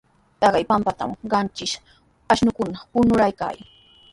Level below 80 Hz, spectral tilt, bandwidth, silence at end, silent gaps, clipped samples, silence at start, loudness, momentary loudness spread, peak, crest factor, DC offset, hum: -48 dBFS; -5 dB/octave; 11.5 kHz; 0.55 s; none; under 0.1%; 0.4 s; -21 LUFS; 12 LU; -4 dBFS; 18 dB; under 0.1%; none